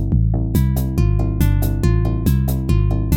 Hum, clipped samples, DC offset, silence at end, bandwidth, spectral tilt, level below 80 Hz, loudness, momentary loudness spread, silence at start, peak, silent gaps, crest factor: none; under 0.1%; under 0.1%; 0 s; 17 kHz; -7.5 dB/octave; -20 dBFS; -18 LUFS; 1 LU; 0 s; -4 dBFS; none; 12 dB